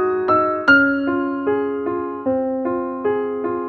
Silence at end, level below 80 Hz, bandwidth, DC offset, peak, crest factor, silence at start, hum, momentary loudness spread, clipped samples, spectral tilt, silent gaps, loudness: 0 s; -54 dBFS; 6.2 kHz; under 0.1%; -2 dBFS; 18 dB; 0 s; none; 9 LU; under 0.1%; -7 dB/octave; none; -19 LUFS